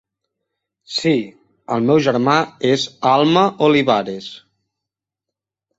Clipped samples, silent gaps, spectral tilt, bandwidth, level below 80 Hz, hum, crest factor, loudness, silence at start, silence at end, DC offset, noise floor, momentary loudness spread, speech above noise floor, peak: under 0.1%; none; -5.5 dB/octave; 8 kHz; -60 dBFS; none; 18 dB; -16 LUFS; 0.9 s; 1.4 s; under 0.1%; -85 dBFS; 13 LU; 69 dB; -2 dBFS